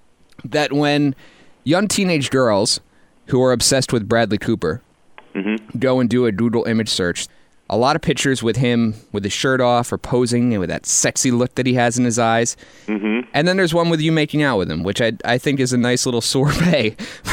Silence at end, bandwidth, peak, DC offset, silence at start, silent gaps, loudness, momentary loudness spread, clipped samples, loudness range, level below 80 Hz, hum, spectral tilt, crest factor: 0 s; 16.5 kHz; -4 dBFS; under 0.1%; 0.45 s; none; -18 LUFS; 8 LU; under 0.1%; 2 LU; -46 dBFS; none; -4.5 dB/octave; 14 dB